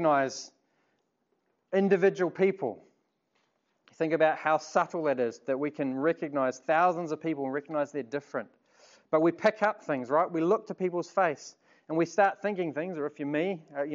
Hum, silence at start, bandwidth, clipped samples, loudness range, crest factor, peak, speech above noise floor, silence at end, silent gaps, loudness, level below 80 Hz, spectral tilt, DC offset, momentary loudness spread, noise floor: none; 0 s; 7.6 kHz; under 0.1%; 2 LU; 20 dB; -10 dBFS; 48 dB; 0 s; none; -29 LUFS; -86 dBFS; -6 dB/octave; under 0.1%; 10 LU; -76 dBFS